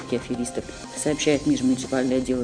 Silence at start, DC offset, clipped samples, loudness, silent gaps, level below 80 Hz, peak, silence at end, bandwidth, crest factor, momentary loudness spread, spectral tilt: 0 s; under 0.1%; under 0.1%; -24 LUFS; none; -48 dBFS; -8 dBFS; 0 s; 10 kHz; 16 dB; 9 LU; -4.5 dB/octave